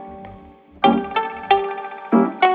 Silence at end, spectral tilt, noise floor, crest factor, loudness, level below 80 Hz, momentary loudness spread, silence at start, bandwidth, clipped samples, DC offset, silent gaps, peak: 0 s; -8 dB/octave; -44 dBFS; 18 dB; -20 LUFS; -54 dBFS; 20 LU; 0 s; 4.8 kHz; under 0.1%; under 0.1%; none; -2 dBFS